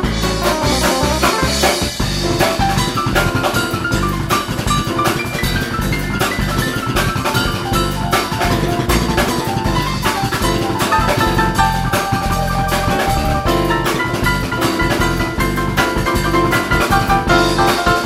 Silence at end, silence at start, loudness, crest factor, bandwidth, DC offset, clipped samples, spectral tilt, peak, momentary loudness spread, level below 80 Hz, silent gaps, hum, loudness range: 0 s; 0 s; -16 LUFS; 16 dB; 16.5 kHz; under 0.1%; under 0.1%; -4.5 dB/octave; 0 dBFS; 4 LU; -26 dBFS; none; none; 2 LU